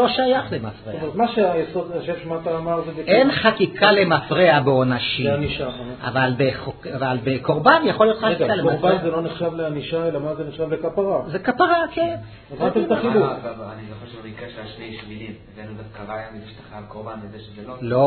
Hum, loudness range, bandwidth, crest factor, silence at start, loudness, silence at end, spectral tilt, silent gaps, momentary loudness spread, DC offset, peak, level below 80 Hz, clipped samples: none; 17 LU; 4.6 kHz; 20 dB; 0 s; -20 LUFS; 0 s; -9.5 dB/octave; none; 21 LU; under 0.1%; 0 dBFS; -50 dBFS; under 0.1%